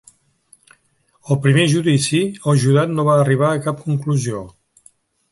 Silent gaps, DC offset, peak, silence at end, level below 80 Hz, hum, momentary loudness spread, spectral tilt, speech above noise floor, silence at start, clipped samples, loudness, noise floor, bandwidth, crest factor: none; under 0.1%; -2 dBFS; 0.8 s; -56 dBFS; none; 8 LU; -6 dB/octave; 45 dB; 1.25 s; under 0.1%; -17 LUFS; -61 dBFS; 11.5 kHz; 16 dB